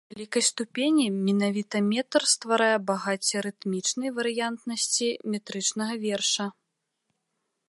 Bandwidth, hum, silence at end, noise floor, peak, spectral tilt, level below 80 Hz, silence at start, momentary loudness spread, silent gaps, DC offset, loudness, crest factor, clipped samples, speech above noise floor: 11.5 kHz; none; 1.2 s; -80 dBFS; -8 dBFS; -3 dB/octave; -78 dBFS; 0.1 s; 7 LU; none; under 0.1%; -26 LUFS; 20 dB; under 0.1%; 53 dB